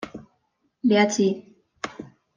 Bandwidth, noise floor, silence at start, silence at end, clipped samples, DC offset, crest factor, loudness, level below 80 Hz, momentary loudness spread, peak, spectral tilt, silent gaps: 9.8 kHz; -71 dBFS; 0 s; 0.3 s; under 0.1%; under 0.1%; 20 dB; -22 LUFS; -66 dBFS; 19 LU; -6 dBFS; -4.5 dB/octave; none